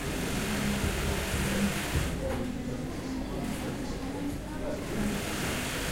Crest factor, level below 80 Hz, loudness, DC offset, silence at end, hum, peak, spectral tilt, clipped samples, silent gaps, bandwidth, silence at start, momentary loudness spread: 16 dB; -40 dBFS; -32 LUFS; under 0.1%; 0 s; none; -14 dBFS; -4.5 dB/octave; under 0.1%; none; 16 kHz; 0 s; 6 LU